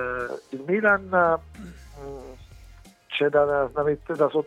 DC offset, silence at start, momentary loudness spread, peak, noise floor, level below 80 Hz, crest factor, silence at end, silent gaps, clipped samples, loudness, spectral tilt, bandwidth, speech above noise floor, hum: under 0.1%; 0 s; 22 LU; -8 dBFS; -49 dBFS; -50 dBFS; 18 dB; 0 s; none; under 0.1%; -24 LUFS; -6.5 dB/octave; 11.5 kHz; 26 dB; none